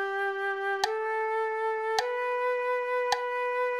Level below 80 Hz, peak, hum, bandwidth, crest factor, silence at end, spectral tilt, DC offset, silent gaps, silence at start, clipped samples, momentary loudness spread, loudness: -74 dBFS; -10 dBFS; none; 16 kHz; 18 dB; 0 s; -0.5 dB/octave; under 0.1%; none; 0 s; under 0.1%; 2 LU; -29 LUFS